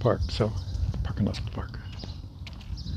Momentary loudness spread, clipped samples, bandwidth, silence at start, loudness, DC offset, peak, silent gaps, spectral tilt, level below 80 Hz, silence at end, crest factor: 13 LU; under 0.1%; 10 kHz; 0 s; -32 LUFS; under 0.1%; -10 dBFS; none; -7 dB/octave; -38 dBFS; 0 s; 20 dB